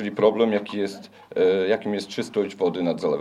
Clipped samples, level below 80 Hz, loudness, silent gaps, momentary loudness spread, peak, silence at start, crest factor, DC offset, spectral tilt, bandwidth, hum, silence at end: under 0.1%; -72 dBFS; -24 LUFS; none; 9 LU; -6 dBFS; 0 s; 18 dB; under 0.1%; -6 dB/octave; 11.5 kHz; none; 0 s